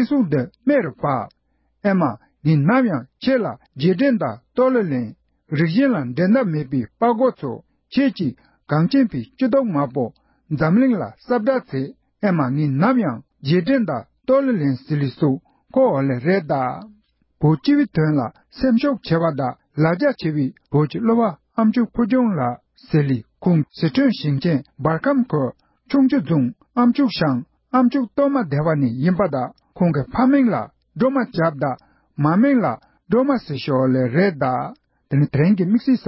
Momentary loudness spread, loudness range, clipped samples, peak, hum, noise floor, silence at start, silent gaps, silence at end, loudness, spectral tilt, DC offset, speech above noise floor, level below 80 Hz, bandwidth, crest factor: 9 LU; 1 LU; under 0.1%; -4 dBFS; none; -44 dBFS; 0 s; none; 0 s; -20 LUFS; -12 dB/octave; under 0.1%; 26 dB; -54 dBFS; 5.8 kHz; 14 dB